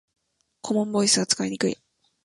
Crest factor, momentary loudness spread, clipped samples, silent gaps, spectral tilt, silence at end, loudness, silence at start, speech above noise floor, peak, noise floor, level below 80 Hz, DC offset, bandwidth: 20 dB; 15 LU; under 0.1%; none; -3 dB/octave; 0.5 s; -23 LUFS; 0.65 s; 21 dB; -6 dBFS; -45 dBFS; -66 dBFS; under 0.1%; 11.5 kHz